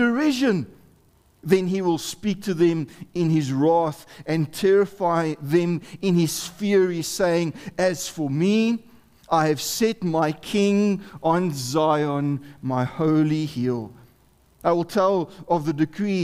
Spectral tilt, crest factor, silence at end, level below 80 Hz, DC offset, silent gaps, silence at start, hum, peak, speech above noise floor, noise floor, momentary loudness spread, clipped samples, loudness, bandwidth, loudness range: -6 dB/octave; 18 dB; 0 s; -58 dBFS; under 0.1%; none; 0 s; none; -4 dBFS; 36 dB; -58 dBFS; 7 LU; under 0.1%; -23 LUFS; 16 kHz; 2 LU